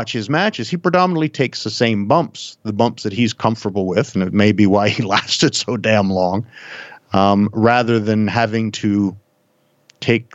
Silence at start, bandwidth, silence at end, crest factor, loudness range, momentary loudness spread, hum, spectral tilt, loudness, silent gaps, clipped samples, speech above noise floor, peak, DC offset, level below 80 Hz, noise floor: 0 s; 8.2 kHz; 0.1 s; 16 dB; 2 LU; 8 LU; none; -5.5 dB/octave; -17 LUFS; none; under 0.1%; 44 dB; 0 dBFS; under 0.1%; -60 dBFS; -61 dBFS